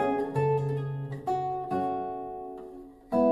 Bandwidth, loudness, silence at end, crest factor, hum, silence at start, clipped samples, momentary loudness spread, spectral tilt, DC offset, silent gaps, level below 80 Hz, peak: 11 kHz; -31 LUFS; 0 s; 16 dB; none; 0 s; under 0.1%; 15 LU; -9 dB/octave; under 0.1%; none; -62 dBFS; -14 dBFS